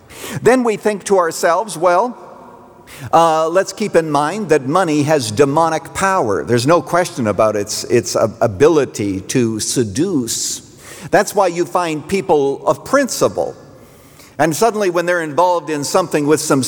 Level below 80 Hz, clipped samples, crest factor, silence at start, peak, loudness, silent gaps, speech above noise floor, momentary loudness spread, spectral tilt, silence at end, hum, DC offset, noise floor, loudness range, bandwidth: -52 dBFS; under 0.1%; 14 dB; 0.1 s; -2 dBFS; -16 LUFS; none; 27 dB; 6 LU; -4.5 dB/octave; 0 s; none; under 0.1%; -42 dBFS; 2 LU; over 20 kHz